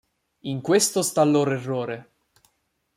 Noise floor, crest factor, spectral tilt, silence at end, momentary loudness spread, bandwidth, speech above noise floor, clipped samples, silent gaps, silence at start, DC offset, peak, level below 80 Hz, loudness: -72 dBFS; 18 dB; -4.5 dB/octave; 0.95 s; 14 LU; 16 kHz; 49 dB; under 0.1%; none; 0.45 s; under 0.1%; -6 dBFS; -68 dBFS; -22 LUFS